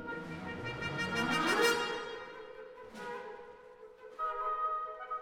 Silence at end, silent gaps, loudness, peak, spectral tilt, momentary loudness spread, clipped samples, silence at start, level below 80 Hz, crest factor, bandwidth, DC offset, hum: 0 s; none; -35 LUFS; -16 dBFS; -3.5 dB/octave; 21 LU; under 0.1%; 0 s; -66 dBFS; 20 dB; 19 kHz; under 0.1%; none